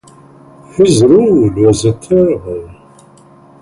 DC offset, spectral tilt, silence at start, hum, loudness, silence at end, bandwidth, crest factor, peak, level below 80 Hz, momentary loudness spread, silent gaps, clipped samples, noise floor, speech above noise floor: under 0.1%; -6.5 dB/octave; 0.75 s; none; -10 LUFS; 0.9 s; 11.5 kHz; 12 dB; 0 dBFS; -40 dBFS; 16 LU; none; under 0.1%; -42 dBFS; 32 dB